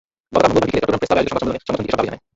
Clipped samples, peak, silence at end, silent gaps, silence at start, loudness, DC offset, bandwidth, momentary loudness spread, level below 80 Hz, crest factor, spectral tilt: under 0.1%; -2 dBFS; 0.2 s; none; 0.3 s; -19 LUFS; under 0.1%; 8 kHz; 7 LU; -42 dBFS; 18 dB; -6 dB/octave